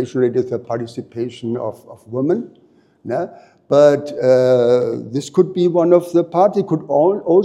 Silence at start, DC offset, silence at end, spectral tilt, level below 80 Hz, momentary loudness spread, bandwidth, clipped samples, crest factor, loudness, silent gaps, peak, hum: 0 s; under 0.1%; 0 s; -7.5 dB/octave; -68 dBFS; 14 LU; 12 kHz; under 0.1%; 16 dB; -17 LUFS; none; 0 dBFS; none